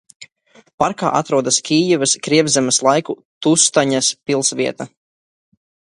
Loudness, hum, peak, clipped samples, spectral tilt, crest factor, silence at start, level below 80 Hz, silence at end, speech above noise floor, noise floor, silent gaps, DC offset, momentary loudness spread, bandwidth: -16 LUFS; none; 0 dBFS; under 0.1%; -3 dB/octave; 18 dB; 0.2 s; -60 dBFS; 1.1 s; 36 dB; -52 dBFS; 0.74-0.78 s, 3.25-3.41 s; under 0.1%; 8 LU; 11.5 kHz